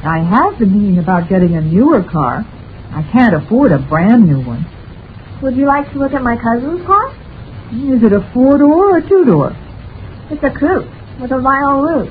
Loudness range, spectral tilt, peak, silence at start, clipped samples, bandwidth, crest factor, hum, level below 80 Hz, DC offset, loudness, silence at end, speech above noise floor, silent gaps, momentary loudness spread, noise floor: 3 LU; -11.5 dB/octave; 0 dBFS; 0 s; under 0.1%; 4.9 kHz; 12 dB; none; -34 dBFS; under 0.1%; -12 LUFS; 0 s; 20 dB; none; 19 LU; -31 dBFS